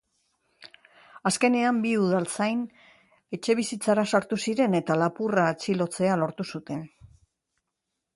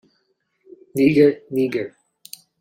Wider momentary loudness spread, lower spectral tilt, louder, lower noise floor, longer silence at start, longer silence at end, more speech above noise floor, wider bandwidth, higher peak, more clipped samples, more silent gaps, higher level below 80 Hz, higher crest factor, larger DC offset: second, 12 LU vs 25 LU; second, -5 dB/octave vs -7 dB/octave; second, -26 LUFS vs -19 LUFS; first, -83 dBFS vs -69 dBFS; second, 0.6 s vs 0.95 s; first, 1.3 s vs 0.7 s; first, 58 dB vs 51 dB; second, 11.5 kHz vs 16.5 kHz; second, -8 dBFS vs -4 dBFS; neither; neither; second, -68 dBFS vs -62 dBFS; about the same, 18 dB vs 18 dB; neither